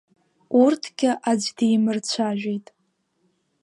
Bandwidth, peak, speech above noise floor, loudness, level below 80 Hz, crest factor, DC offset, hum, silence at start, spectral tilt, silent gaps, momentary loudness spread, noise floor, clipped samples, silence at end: 11.5 kHz; -6 dBFS; 48 dB; -22 LUFS; -76 dBFS; 18 dB; under 0.1%; none; 0.5 s; -4.5 dB/octave; none; 8 LU; -69 dBFS; under 0.1%; 1.05 s